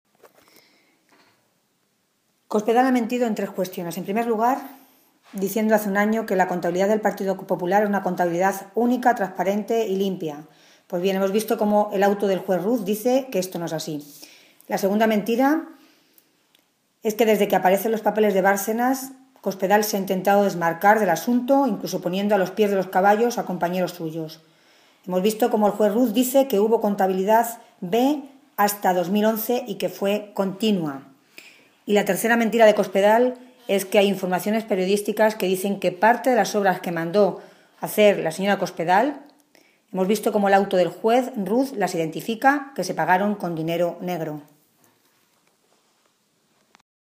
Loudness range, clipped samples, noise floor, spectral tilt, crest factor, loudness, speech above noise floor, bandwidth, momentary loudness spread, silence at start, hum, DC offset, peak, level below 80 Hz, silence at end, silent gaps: 4 LU; under 0.1%; -69 dBFS; -5 dB/octave; 18 dB; -21 LUFS; 48 dB; 15.5 kHz; 10 LU; 2.5 s; none; under 0.1%; -4 dBFS; -76 dBFS; 2.75 s; none